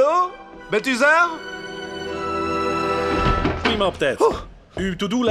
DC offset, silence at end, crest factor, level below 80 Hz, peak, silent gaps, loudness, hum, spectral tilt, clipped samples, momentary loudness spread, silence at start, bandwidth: under 0.1%; 0 s; 18 dB; -36 dBFS; -4 dBFS; none; -21 LUFS; none; -5 dB/octave; under 0.1%; 14 LU; 0 s; 14.5 kHz